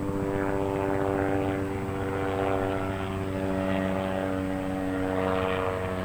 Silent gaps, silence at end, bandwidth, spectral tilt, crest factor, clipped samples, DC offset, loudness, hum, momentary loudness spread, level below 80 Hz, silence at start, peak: none; 0 s; over 20 kHz; -7 dB/octave; 16 dB; under 0.1%; under 0.1%; -29 LUFS; none; 4 LU; -46 dBFS; 0 s; -12 dBFS